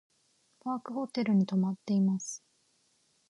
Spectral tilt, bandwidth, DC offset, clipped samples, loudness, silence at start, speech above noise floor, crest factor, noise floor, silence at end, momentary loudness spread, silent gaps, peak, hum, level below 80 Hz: -6.5 dB/octave; 11 kHz; under 0.1%; under 0.1%; -31 LUFS; 0.65 s; 42 dB; 14 dB; -71 dBFS; 0.9 s; 14 LU; none; -18 dBFS; none; -80 dBFS